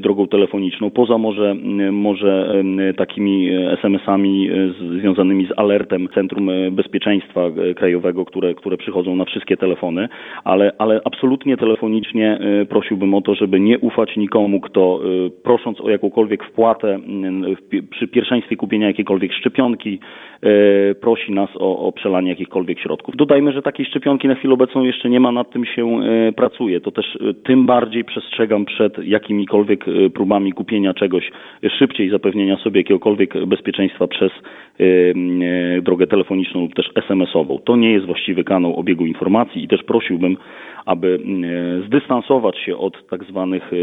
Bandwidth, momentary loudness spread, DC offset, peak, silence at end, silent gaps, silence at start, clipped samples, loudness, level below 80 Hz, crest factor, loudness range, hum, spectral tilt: 4 kHz; 7 LU; under 0.1%; 0 dBFS; 0 s; none; 0 s; under 0.1%; -17 LUFS; -62 dBFS; 16 dB; 2 LU; none; -9 dB/octave